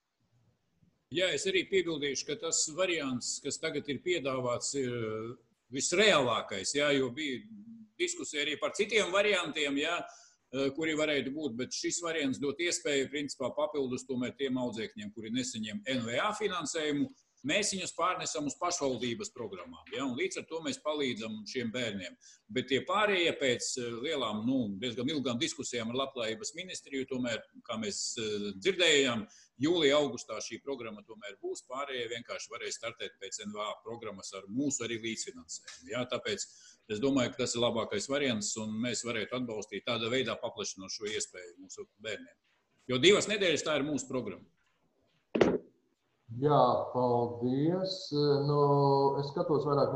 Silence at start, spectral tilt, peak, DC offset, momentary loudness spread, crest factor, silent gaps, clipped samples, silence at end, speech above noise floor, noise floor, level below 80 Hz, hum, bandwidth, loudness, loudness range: 1.1 s; -3.5 dB/octave; -10 dBFS; under 0.1%; 14 LU; 24 dB; none; under 0.1%; 0 s; 43 dB; -76 dBFS; -70 dBFS; none; 12 kHz; -32 LUFS; 6 LU